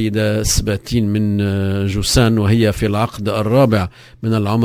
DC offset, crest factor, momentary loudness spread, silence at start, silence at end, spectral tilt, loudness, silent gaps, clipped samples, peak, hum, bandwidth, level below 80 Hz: under 0.1%; 16 dB; 6 LU; 0 s; 0 s; -5.5 dB/octave; -16 LUFS; none; under 0.1%; 0 dBFS; none; 16 kHz; -30 dBFS